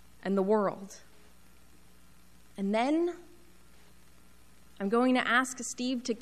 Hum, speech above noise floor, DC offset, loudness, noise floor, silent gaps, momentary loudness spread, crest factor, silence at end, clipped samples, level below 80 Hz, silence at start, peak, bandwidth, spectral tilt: none; 31 dB; 0.2%; -30 LUFS; -60 dBFS; none; 21 LU; 18 dB; 0 s; under 0.1%; -66 dBFS; 0.25 s; -14 dBFS; 14 kHz; -4.5 dB/octave